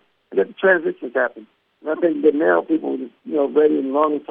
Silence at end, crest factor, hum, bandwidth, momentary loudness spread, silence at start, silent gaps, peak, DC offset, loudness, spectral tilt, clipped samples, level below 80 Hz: 0.1 s; 16 dB; none; 3.7 kHz; 9 LU; 0.3 s; none; -2 dBFS; under 0.1%; -19 LUFS; -9 dB/octave; under 0.1%; -74 dBFS